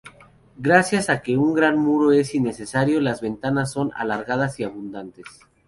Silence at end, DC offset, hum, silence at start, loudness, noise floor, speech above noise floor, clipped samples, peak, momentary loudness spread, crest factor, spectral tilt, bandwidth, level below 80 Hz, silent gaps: 0.4 s; under 0.1%; none; 0.05 s; -21 LUFS; -50 dBFS; 29 dB; under 0.1%; -2 dBFS; 13 LU; 20 dB; -6 dB/octave; 11.5 kHz; -56 dBFS; none